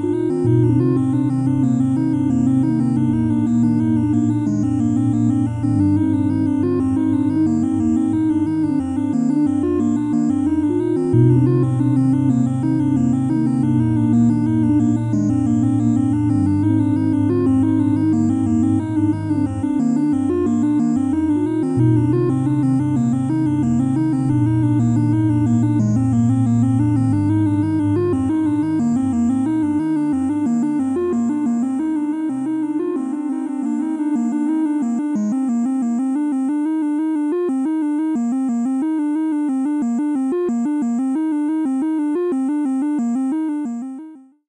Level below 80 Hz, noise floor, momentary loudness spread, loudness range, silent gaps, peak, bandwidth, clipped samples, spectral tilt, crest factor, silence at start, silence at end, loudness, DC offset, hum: -50 dBFS; -39 dBFS; 4 LU; 3 LU; none; -4 dBFS; 10.5 kHz; under 0.1%; -9.5 dB/octave; 14 dB; 0 s; 0.3 s; -18 LUFS; under 0.1%; none